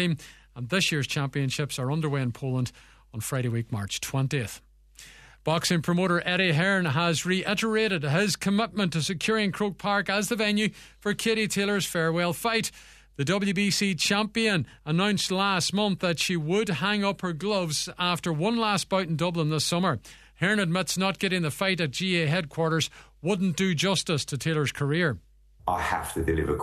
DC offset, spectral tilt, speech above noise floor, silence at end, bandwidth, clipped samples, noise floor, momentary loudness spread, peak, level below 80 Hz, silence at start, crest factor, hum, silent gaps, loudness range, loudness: under 0.1%; -4.5 dB/octave; 25 dB; 0 s; 14 kHz; under 0.1%; -51 dBFS; 7 LU; -10 dBFS; -52 dBFS; 0 s; 16 dB; none; none; 4 LU; -26 LUFS